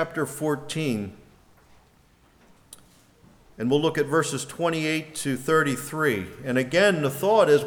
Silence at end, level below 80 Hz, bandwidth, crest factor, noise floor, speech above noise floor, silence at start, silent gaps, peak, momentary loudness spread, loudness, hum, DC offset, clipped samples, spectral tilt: 0 s; -60 dBFS; over 20 kHz; 18 dB; -59 dBFS; 35 dB; 0 s; none; -6 dBFS; 9 LU; -24 LUFS; none; under 0.1%; under 0.1%; -5 dB/octave